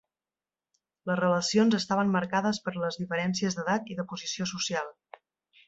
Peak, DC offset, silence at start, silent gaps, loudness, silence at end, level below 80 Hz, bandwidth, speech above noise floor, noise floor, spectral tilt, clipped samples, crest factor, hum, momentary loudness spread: -12 dBFS; under 0.1%; 1.05 s; none; -28 LUFS; 0.75 s; -70 dBFS; 8 kHz; over 62 dB; under -90 dBFS; -4.5 dB/octave; under 0.1%; 18 dB; none; 10 LU